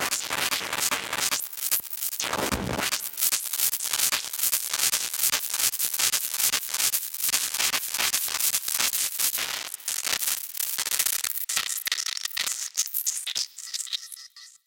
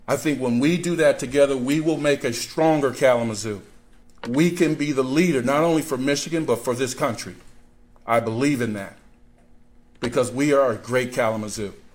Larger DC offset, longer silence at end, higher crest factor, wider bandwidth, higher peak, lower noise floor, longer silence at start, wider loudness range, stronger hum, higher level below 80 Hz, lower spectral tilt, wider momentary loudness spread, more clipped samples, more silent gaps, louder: neither; about the same, 0.15 s vs 0.1 s; first, 24 dB vs 16 dB; about the same, 17.5 kHz vs 16.5 kHz; first, -2 dBFS vs -6 dBFS; second, -47 dBFS vs -51 dBFS; about the same, 0 s vs 0.1 s; about the same, 3 LU vs 5 LU; neither; about the same, -56 dBFS vs -52 dBFS; second, 0.5 dB/octave vs -5 dB/octave; second, 6 LU vs 11 LU; neither; neither; second, -25 LUFS vs -22 LUFS